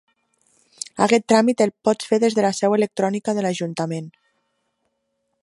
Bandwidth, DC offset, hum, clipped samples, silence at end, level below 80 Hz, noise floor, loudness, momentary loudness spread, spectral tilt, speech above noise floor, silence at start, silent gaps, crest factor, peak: 11.5 kHz; under 0.1%; none; under 0.1%; 1.35 s; -70 dBFS; -73 dBFS; -20 LUFS; 13 LU; -5 dB/octave; 54 dB; 0.95 s; none; 20 dB; -2 dBFS